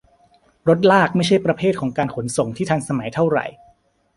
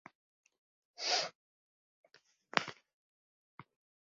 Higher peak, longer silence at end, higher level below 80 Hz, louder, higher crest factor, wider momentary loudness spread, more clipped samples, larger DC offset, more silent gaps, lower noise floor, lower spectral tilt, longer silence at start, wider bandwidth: first, -2 dBFS vs -6 dBFS; first, 0.65 s vs 0.4 s; first, -54 dBFS vs under -90 dBFS; first, -19 LUFS vs -36 LUFS; second, 18 dB vs 38 dB; about the same, 9 LU vs 10 LU; neither; neither; second, none vs 1.35-2.04 s, 2.94-3.58 s; about the same, -57 dBFS vs -59 dBFS; first, -6 dB/octave vs 1 dB/octave; second, 0.65 s vs 1 s; first, 11.5 kHz vs 7.4 kHz